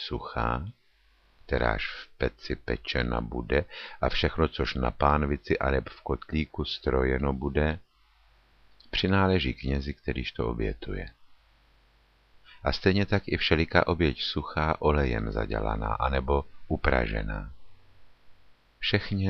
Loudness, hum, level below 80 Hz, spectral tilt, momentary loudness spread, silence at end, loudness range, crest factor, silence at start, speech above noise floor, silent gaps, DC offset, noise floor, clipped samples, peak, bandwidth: -28 LUFS; none; -36 dBFS; -7.5 dB/octave; 10 LU; 0 s; 5 LU; 24 dB; 0 s; 35 dB; none; under 0.1%; -63 dBFS; under 0.1%; -6 dBFS; 6.6 kHz